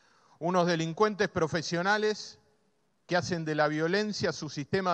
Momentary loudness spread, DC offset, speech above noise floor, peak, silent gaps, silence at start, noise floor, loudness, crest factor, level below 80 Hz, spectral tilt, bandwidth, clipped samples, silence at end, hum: 6 LU; under 0.1%; 45 dB; -12 dBFS; none; 0.4 s; -73 dBFS; -29 LUFS; 18 dB; -66 dBFS; -5 dB/octave; 8.8 kHz; under 0.1%; 0 s; none